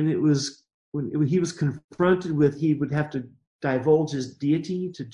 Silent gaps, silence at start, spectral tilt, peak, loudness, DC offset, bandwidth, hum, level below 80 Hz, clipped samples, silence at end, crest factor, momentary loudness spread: 0.74-0.92 s, 1.84-1.89 s, 3.47-3.59 s; 0 s; -7 dB/octave; -8 dBFS; -25 LUFS; under 0.1%; 10.5 kHz; none; -60 dBFS; under 0.1%; 0 s; 16 dB; 10 LU